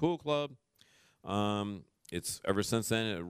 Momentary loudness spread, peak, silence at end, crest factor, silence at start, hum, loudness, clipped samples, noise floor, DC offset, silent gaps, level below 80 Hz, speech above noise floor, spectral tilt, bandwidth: 11 LU; -16 dBFS; 0 s; 20 dB; 0 s; none; -34 LUFS; under 0.1%; -66 dBFS; under 0.1%; none; -64 dBFS; 33 dB; -4.5 dB/octave; 15.5 kHz